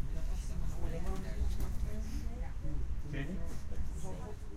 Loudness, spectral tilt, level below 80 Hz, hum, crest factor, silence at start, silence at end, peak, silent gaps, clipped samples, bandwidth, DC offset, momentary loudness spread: -42 LUFS; -6.5 dB/octave; -38 dBFS; none; 12 dB; 0 s; 0 s; -22 dBFS; none; under 0.1%; 13.5 kHz; under 0.1%; 4 LU